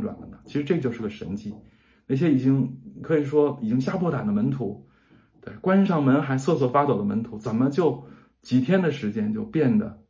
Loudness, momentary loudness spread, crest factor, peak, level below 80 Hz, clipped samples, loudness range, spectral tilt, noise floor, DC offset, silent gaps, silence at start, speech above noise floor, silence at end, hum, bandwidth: -24 LUFS; 13 LU; 16 dB; -8 dBFS; -58 dBFS; under 0.1%; 2 LU; -8.5 dB/octave; -57 dBFS; under 0.1%; none; 0 s; 34 dB; 0.15 s; none; 7.6 kHz